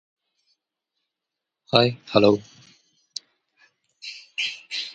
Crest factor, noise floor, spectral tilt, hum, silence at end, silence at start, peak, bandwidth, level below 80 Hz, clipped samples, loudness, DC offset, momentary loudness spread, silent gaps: 26 dB; -85 dBFS; -5 dB/octave; none; 0 s; 1.7 s; 0 dBFS; 9.8 kHz; -64 dBFS; under 0.1%; -22 LUFS; under 0.1%; 19 LU; none